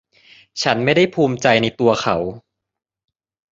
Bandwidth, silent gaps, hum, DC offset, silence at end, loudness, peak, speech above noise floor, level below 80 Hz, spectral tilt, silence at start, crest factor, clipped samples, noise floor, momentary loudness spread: 7.8 kHz; none; none; under 0.1%; 1.15 s; -17 LUFS; 0 dBFS; 33 dB; -52 dBFS; -5 dB/octave; 0.55 s; 18 dB; under 0.1%; -50 dBFS; 8 LU